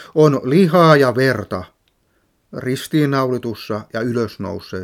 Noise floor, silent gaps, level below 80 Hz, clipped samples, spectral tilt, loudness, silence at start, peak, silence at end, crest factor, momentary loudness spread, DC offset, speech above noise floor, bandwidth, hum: -63 dBFS; none; -58 dBFS; under 0.1%; -7 dB/octave; -16 LUFS; 0 s; 0 dBFS; 0 s; 18 dB; 16 LU; under 0.1%; 47 dB; 16 kHz; none